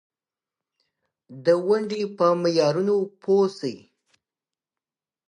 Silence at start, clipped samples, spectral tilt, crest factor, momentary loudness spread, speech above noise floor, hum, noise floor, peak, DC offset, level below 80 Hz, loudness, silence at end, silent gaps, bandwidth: 1.3 s; under 0.1%; -6 dB/octave; 18 dB; 7 LU; over 68 dB; none; under -90 dBFS; -6 dBFS; under 0.1%; -78 dBFS; -23 LUFS; 1.5 s; none; 10 kHz